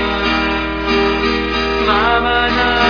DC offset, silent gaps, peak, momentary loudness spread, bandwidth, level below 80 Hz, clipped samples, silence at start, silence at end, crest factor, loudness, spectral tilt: under 0.1%; none; 0 dBFS; 3 LU; 5.4 kHz; -28 dBFS; under 0.1%; 0 s; 0 s; 14 dB; -15 LUFS; -5 dB/octave